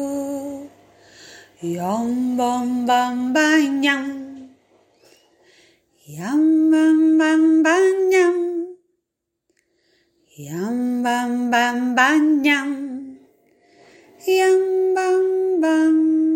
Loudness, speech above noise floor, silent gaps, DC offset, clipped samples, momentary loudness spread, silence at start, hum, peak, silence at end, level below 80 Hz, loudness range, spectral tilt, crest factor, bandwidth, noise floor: -18 LUFS; 62 dB; none; under 0.1%; under 0.1%; 16 LU; 0 s; none; -2 dBFS; 0 s; -68 dBFS; 6 LU; -4.5 dB/octave; 18 dB; 16 kHz; -79 dBFS